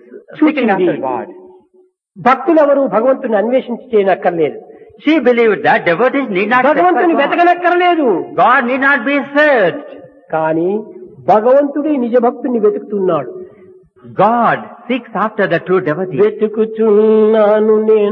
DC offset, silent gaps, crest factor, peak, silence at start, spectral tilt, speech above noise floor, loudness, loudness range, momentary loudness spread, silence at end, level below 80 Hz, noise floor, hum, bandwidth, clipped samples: under 0.1%; none; 12 dB; 0 dBFS; 0.1 s; -8 dB/octave; 40 dB; -13 LUFS; 4 LU; 9 LU; 0 s; -66 dBFS; -52 dBFS; none; 6 kHz; under 0.1%